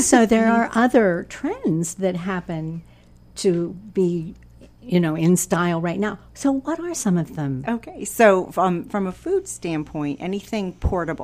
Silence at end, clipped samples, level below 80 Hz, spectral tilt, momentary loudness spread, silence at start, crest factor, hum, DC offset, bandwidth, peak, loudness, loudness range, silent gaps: 0 s; under 0.1%; -42 dBFS; -5.5 dB/octave; 11 LU; 0 s; 20 dB; none; under 0.1%; 15.5 kHz; -2 dBFS; -22 LUFS; 3 LU; none